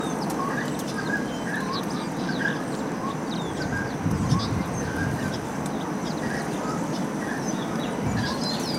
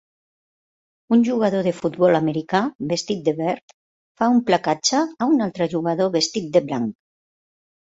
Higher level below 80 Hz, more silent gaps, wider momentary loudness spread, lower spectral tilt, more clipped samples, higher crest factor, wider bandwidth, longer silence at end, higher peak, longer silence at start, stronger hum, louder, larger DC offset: first, -48 dBFS vs -64 dBFS; second, none vs 2.75-2.79 s, 3.63-3.68 s, 3.74-4.15 s; second, 3 LU vs 7 LU; about the same, -5 dB/octave vs -5 dB/octave; neither; about the same, 18 dB vs 18 dB; first, 16 kHz vs 8 kHz; second, 0 s vs 1 s; second, -10 dBFS vs -2 dBFS; second, 0 s vs 1.1 s; neither; second, -28 LUFS vs -21 LUFS; neither